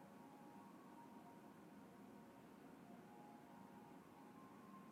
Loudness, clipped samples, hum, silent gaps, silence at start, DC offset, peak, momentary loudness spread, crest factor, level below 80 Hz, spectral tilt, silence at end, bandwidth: -62 LUFS; under 0.1%; none; none; 0 s; under 0.1%; -50 dBFS; 1 LU; 12 dB; under -90 dBFS; -6 dB/octave; 0 s; 15.5 kHz